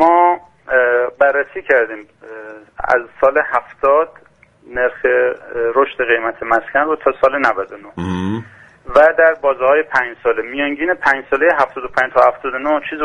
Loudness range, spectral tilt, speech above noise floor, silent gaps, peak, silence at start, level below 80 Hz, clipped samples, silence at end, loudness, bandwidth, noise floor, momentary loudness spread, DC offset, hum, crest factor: 3 LU; -6.5 dB/octave; 18 dB; none; 0 dBFS; 0 s; -48 dBFS; under 0.1%; 0 s; -15 LUFS; 9.4 kHz; -34 dBFS; 11 LU; under 0.1%; none; 16 dB